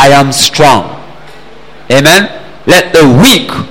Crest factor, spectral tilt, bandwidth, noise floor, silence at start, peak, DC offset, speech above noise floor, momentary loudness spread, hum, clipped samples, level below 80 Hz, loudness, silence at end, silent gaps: 8 dB; -4 dB/octave; over 20 kHz; -33 dBFS; 0 s; 0 dBFS; 5%; 28 dB; 10 LU; none; 2%; -34 dBFS; -5 LUFS; 0 s; none